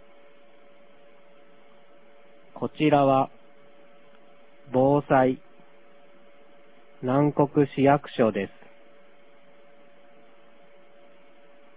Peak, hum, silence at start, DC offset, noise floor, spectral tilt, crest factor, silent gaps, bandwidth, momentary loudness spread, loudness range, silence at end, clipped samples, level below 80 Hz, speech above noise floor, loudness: -6 dBFS; none; 2.55 s; 0.4%; -57 dBFS; -11 dB/octave; 22 dB; none; 4 kHz; 14 LU; 4 LU; 3.3 s; under 0.1%; -64 dBFS; 35 dB; -24 LUFS